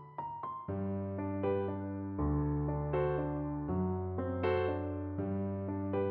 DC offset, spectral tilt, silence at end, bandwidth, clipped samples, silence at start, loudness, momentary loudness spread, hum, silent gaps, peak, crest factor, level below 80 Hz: under 0.1%; -8.5 dB/octave; 0 s; 4.5 kHz; under 0.1%; 0 s; -36 LUFS; 6 LU; none; none; -20 dBFS; 16 dB; -46 dBFS